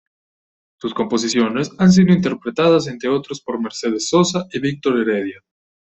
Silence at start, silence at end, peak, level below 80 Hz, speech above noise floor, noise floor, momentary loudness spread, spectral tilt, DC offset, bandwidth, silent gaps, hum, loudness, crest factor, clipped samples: 0.85 s; 0.55 s; -2 dBFS; -56 dBFS; over 73 dB; under -90 dBFS; 12 LU; -5.5 dB/octave; under 0.1%; 8.2 kHz; none; none; -18 LUFS; 16 dB; under 0.1%